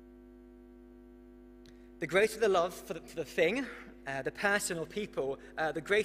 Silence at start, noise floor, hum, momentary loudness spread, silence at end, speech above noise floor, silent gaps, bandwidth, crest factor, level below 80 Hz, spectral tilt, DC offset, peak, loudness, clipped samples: 0 s; -54 dBFS; 50 Hz at -60 dBFS; 13 LU; 0 s; 22 dB; none; 15.5 kHz; 20 dB; -60 dBFS; -3.5 dB/octave; under 0.1%; -14 dBFS; -33 LUFS; under 0.1%